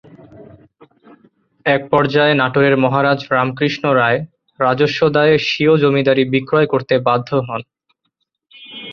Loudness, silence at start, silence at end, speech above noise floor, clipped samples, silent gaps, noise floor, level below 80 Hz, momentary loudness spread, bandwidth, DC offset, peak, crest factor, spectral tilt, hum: -15 LUFS; 0.4 s; 0 s; 57 dB; under 0.1%; none; -71 dBFS; -56 dBFS; 8 LU; 6.8 kHz; under 0.1%; -2 dBFS; 16 dB; -7 dB/octave; none